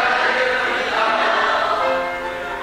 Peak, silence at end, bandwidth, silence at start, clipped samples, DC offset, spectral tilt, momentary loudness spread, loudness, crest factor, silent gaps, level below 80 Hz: -4 dBFS; 0 s; 16 kHz; 0 s; under 0.1%; under 0.1%; -2.5 dB/octave; 7 LU; -18 LUFS; 16 dB; none; -50 dBFS